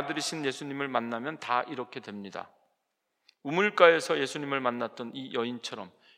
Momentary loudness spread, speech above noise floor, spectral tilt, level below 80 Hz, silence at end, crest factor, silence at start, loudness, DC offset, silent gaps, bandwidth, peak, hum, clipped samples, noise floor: 19 LU; 51 dB; -4 dB/octave; under -90 dBFS; 0.3 s; 28 dB; 0 s; -29 LUFS; under 0.1%; none; 15 kHz; -4 dBFS; none; under 0.1%; -81 dBFS